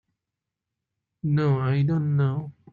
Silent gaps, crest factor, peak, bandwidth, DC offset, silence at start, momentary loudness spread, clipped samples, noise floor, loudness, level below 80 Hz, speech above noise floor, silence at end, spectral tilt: none; 14 dB; -12 dBFS; 4.7 kHz; under 0.1%; 1.25 s; 8 LU; under 0.1%; -86 dBFS; -24 LUFS; -62 dBFS; 63 dB; 0.2 s; -10.5 dB/octave